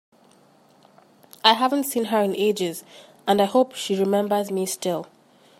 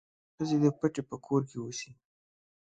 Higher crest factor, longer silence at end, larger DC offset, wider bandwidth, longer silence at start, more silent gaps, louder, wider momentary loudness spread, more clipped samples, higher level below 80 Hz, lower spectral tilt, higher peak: about the same, 22 dB vs 18 dB; second, 0.55 s vs 0.7 s; neither; first, 16 kHz vs 9 kHz; first, 1.45 s vs 0.4 s; neither; first, -22 LUFS vs -32 LUFS; about the same, 10 LU vs 12 LU; neither; about the same, -74 dBFS vs -70 dBFS; second, -4 dB/octave vs -6.5 dB/octave; first, -2 dBFS vs -14 dBFS